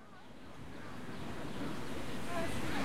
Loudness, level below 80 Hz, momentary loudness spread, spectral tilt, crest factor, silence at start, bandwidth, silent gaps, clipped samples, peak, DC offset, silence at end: -43 LUFS; -58 dBFS; 14 LU; -5 dB/octave; 16 dB; 0 s; 16.5 kHz; none; under 0.1%; -24 dBFS; under 0.1%; 0 s